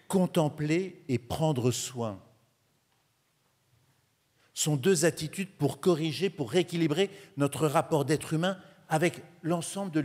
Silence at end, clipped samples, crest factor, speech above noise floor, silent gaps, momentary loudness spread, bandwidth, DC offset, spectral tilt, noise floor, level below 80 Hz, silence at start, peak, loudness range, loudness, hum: 0 s; under 0.1%; 20 dB; 43 dB; none; 8 LU; 16 kHz; under 0.1%; -5 dB/octave; -72 dBFS; -66 dBFS; 0.1 s; -10 dBFS; 7 LU; -29 LUFS; none